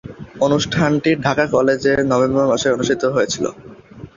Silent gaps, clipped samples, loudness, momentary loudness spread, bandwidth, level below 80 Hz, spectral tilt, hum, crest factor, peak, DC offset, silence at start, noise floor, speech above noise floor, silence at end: none; under 0.1%; -17 LUFS; 5 LU; 7.6 kHz; -48 dBFS; -5 dB/octave; none; 16 dB; -2 dBFS; under 0.1%; 0.05 s; -38 dBFS; 21 dB; 0.1 s